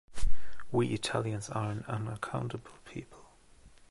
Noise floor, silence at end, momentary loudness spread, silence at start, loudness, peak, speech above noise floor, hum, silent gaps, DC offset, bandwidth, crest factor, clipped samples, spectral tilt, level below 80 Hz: -58 dBFS; 0 s; 15 LU; 0.05 s; -36 LUFS; -12 dBFS; 23 dB; none; none; under 0.1%; 11.5 kHz; 16 dB; under 0.1%; -5.5 dB/octave; -44 dBFS